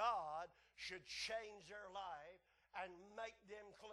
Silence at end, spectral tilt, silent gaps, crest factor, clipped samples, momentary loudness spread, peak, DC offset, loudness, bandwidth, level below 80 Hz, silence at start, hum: 0 s; -1.5 dB/octave; none; 20 dB; under 0.1%; 12 LU; -30 dBFS; under 0.1%; -51 LUFS; 12 kHz; -80 dBFS; 0 s; none